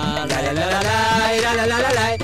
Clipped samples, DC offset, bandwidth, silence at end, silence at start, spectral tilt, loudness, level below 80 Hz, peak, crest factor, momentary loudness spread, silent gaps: under 0.1%; under 0.1%; 16 kHz; 0 s; 0 s; -4 dB/octave; -18 LUFS; -40 dBFS; -6 dBFS; 12 dB; 4 LU; none